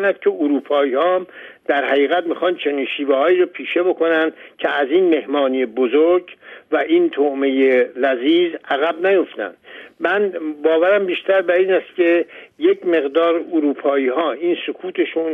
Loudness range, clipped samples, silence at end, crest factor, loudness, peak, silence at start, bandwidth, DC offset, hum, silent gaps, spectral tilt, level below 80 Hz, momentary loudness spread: 1 LU; under 0.1%; 0 s; 14 dB; -18 LUFS; -4 dBFS; 0 s; 3.9 kHz; under 0.1%; none; none; -6.5 dB/octave; -72 dBFS; 7 LU